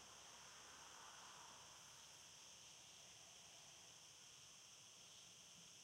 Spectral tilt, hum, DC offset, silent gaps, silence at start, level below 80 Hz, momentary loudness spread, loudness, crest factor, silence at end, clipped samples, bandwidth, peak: 0 dB/octave; none; under 0.1%; none; 0 s; -88 dBFS; 2 LU; -60 LUFS; 16 dB; 0 s; under 0.1%; 16 kHz; -48 dBFS